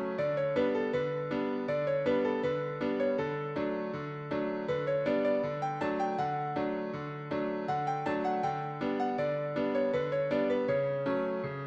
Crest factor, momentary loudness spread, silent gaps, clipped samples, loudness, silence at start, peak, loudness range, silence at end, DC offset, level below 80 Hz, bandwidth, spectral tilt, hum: 14 dB; 5 LU; none; under 0.1%; -32 LUFS; 0 s; -18 dBFS; 2 LU; 0 s; under 0.1%; -66 dBFS; 7.8 kHz; -7.5 dB/octave; none